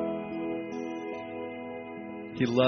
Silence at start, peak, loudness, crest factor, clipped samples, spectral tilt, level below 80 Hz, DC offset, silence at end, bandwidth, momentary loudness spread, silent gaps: 0 s; -10 dBFS; -36 LUFS; 22 dB; under 0.1%; -5 dB/octave; -70 dBFS; under 0.1%; 0 s; 6.4 kHz; 8 LU; none